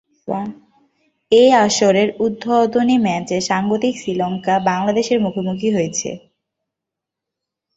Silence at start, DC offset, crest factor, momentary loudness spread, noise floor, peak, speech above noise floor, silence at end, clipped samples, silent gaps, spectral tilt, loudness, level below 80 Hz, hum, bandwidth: 0.25 s; under 0.1%; 16 dB; 12 LU; -83 dBFS; -2 dBFS; 67 dB; 1.6 s; under 0.1%; none; -4.5 dB/octave; -17 LUFS; -58 dBFS; none; 8.2 kHz